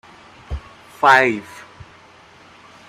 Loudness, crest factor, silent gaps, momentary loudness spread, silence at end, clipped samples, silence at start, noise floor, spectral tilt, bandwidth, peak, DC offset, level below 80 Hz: -15 LUFS; 20 dB; none; 25 LU; 1.3 s; under 0.1%; 0.5 s; -47 dBFS; -4.5 dB/octave; 15.5 kHz; 0 dBFS; under 0.1%; -42 dBFS